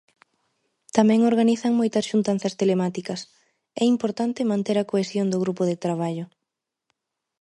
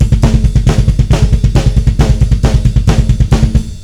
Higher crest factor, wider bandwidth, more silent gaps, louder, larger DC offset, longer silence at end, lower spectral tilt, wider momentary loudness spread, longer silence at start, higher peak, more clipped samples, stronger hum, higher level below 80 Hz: first, 22 dB vs 8 dB; about the same, 11.5 kHz vs 11.5 kHz; neither; second, -23 LUFS vs -11 LUFS; second, under 0.1% vs 1%; first, 1.15 s vs 0 s; about the same, -6 dB/octave vs -7 dB/octave; first, 12 LU vs 1 LU; first, 0.95 s vs 0 s; about the same, -2 dBFS vs 0 dBFS; second, under 0.1% vs 4%; neither; second, -70 dBFS vs -12 dBFS